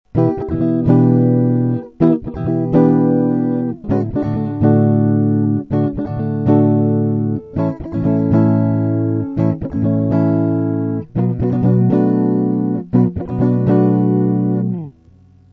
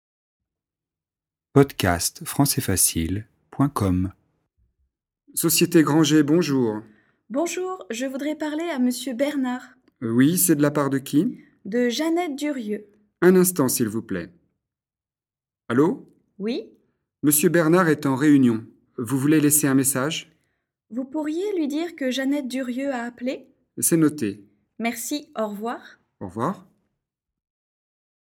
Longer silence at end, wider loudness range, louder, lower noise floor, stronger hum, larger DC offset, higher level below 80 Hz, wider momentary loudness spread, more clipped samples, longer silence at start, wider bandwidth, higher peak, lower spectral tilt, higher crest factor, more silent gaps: second, 0.6 s vs 1.65 s; second, 2 LU vs 7 LU; first, -16 LUFS vs -22 LUFS; second, -47 dBFS vs under -90 dBFS; neither; neither; first, -42 dBFS vs -54 dBFS; second, 7 LU vs 15 LU; neither; second, 0.15 s vs 1.55 s; second, 4.5 kHz vs 18 kHz; about the same, -2 dBFS vs 0 dBFS; first, -12.5 dB/octave vs -4.5 dB/octave; second, 14 dB vs 24 dB; neither